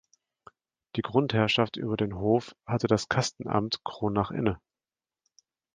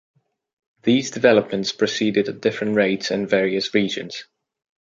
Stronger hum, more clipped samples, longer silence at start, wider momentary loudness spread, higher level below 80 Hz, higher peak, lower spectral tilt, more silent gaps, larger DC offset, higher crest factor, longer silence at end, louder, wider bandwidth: neither; neither; about the same, 0.95 s vs 0.85 s; about the same, 8 LU vs 9 LU; first, -54 dBFS vs -64 dBFS; second, -8 dBFS vs -2 dBFS; about the same, -5.5 dB/octave vs -4.5 dB/octave; neither; neither; about the same, 22 dB vs 20 dB; first, 1.2 s vs 0.6 s; second, -28 LUFS vs -20 LUFS; first, 9.8 kHz vs 7.8 kHz